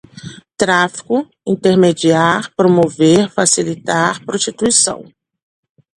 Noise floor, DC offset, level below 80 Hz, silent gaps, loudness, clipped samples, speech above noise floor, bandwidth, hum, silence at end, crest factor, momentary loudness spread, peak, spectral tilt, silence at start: -34 dBFS; under 0.1%; -54 dBFS; none; -14 LUFS; under 0.1%; 21 dB; 11.5 kHz; none; 0.95 s; 14 dB; 8 LU; 0 dBFS; -4 dB/octave; 0.15 s